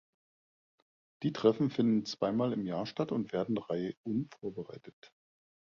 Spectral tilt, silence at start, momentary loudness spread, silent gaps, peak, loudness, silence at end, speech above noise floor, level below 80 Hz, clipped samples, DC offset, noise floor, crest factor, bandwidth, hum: -7.5 dB/octave; 1.2 s; 13 LU; 3.97-4.04 s, 4.93-5.02 s; -14 dBFS; -33 LUFS; 0.7 s; over 57 dB; -72 dBFS; under 0.1%; under 0.1%; under -90 dBFS; 22 dB; 7.2 kHz; none